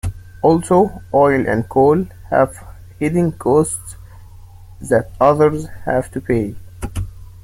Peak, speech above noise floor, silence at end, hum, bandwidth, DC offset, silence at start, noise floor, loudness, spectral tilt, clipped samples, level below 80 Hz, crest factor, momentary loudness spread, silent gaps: -2 dBFS; 23 dB; 0.05 s; none; 16 kHz; under 0.1%; 0.05 s; -38 dBFS; -17 LUFS; -7 dB/octave; under 0.1%; -38 dBFS; 16 dB; 15 LU; none